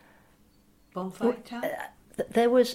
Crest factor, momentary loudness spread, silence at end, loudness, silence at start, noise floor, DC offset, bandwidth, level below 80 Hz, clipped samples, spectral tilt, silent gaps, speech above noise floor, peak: 18 dB; 16 LU; 0 s; -29 LUFS; 0.95 s; -61 dBFS; under 0.1%; 16 kHz; -66 dBFS; under 0.1%; -5 dB/octave; none; 35 dB; -12 dBFS